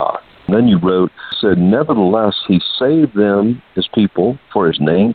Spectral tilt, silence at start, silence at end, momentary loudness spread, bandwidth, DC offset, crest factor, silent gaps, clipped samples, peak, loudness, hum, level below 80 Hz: -10.5 dB/octave; 0 s; 0 s; 6 LU; 4.7 kHz; under 0.1%; 14 dB; none; under 0.1%; 0 dBFS; -14 LUFS; none; -48 dBFS